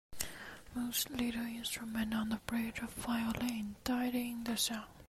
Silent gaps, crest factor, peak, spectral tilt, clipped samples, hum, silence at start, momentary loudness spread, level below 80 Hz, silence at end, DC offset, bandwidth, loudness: none; 24 dB; -14 dBFS; -3 dB/octave; under 0.1%; none; 0.1 s; 7 LU; -60 dBFS; 0 s; under 0.1%; 15.5 kHz; -38 LUFS